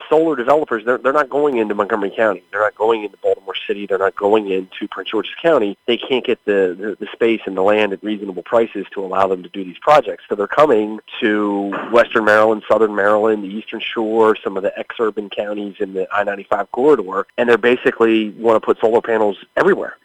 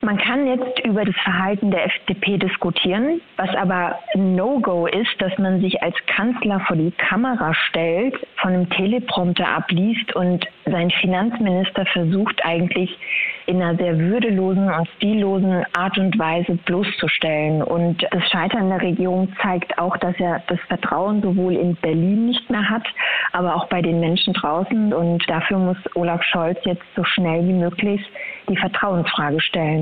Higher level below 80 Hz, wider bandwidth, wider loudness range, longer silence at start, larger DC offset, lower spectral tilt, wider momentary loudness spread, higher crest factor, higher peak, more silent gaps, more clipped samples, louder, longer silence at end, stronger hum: about the same, -60 dBFS vs -56 dBFS; first, 9.2 kHz vs 4.6 kHz; about the same, 3 LU vs 1 LU; about the same, 0 s vs 0 s; second, under 0.1% vs 0.2%; second, -6 dB/octave vs -8.5 dB/octave; first, 10 LU vs 3 LU; about the same, 16 dB vs 18 dB; about the same, 0 dBFS vs -2 dBFS; neither; neither; about the same, -17 LUFS vs -19 LUFS; about the same, 0.1 s vs 0 s; neither